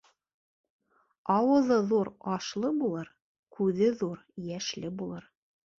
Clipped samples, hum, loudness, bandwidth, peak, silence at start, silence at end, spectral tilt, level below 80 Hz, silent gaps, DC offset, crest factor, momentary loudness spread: under 0.1%; none; -29 LUFS; 7.6 kHz; -12 dBFS; 1.25 s; 0.6 s; -6 dB/octave; -70 dBFS; 3.22-3.43 s; under 0.1%; 18 dB; 15 LU